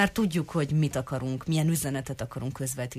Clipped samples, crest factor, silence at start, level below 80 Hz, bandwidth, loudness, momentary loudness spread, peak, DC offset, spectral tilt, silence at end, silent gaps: under 0.1%; 18 dB; 0 s; -52 dBFS; 15.5 kHz; -29 LUFS; 8 LU; -10 dBFS; under 0.1%; -5.5 dB/octave; 0 s; none